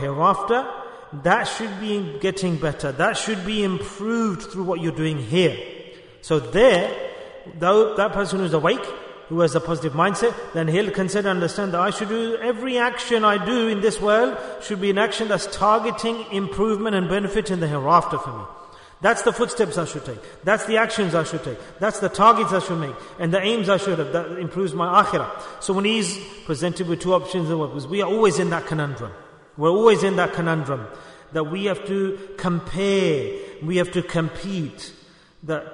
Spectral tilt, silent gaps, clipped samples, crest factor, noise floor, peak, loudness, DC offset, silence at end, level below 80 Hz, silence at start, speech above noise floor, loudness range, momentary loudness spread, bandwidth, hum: -5 dB/octave; none; under 0.1%; 18 dB; -47 dBFS; -2 dBFS; -22 LUFS; under 0.1%; 0 s; -50 dBFS; 0 s; 26 dB; 3 LU; 12 LU; 11 kHz; none